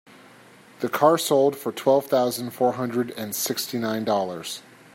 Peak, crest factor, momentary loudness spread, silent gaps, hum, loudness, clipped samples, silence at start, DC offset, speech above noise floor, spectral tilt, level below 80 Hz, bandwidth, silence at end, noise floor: -4 dBFS; 20 dB; 10 LU; none; none; -23 LUFS; under 0.1%; 0.8 s; under 0.1%; 27 dB; -4 dB/octave; -74 dBFS; 16.5 kHz; 0.35 s; -50 dBFS